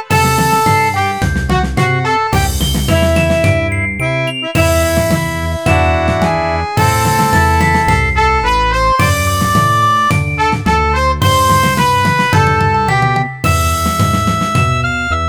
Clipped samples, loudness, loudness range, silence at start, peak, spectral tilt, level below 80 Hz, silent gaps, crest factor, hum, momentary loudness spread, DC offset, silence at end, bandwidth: under 0.1%; -12 LUFS; 2 LU; 0 s; 0 dBFS; -5 dB/octave; -24 dBFS; none; 12 dB; none; 4 LU; 0.5%; 0 s; over 20 kHz